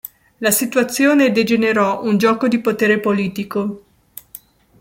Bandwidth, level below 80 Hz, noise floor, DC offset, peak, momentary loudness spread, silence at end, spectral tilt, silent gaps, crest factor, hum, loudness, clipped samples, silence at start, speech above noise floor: 17 kHz; -60 dBFS; -42 dBFS; under 0.1%; -2 dBFS; 13 LU; 0.45 s; -4.5 dB/octave; none; 16 dB; none; -16 LUFS; under 0.1%; 0.4 s; 26 dB